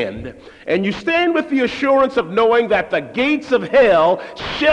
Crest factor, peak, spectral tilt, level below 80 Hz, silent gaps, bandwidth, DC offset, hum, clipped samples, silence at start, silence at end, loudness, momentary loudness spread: 12 dB; -4 dBFS; -6 dB/octave; -48 dBFS; none; 9.8 kHz; under 0.1%; none; under 0.1%; 0 s; 0 s; -16 LUFS; 12 LU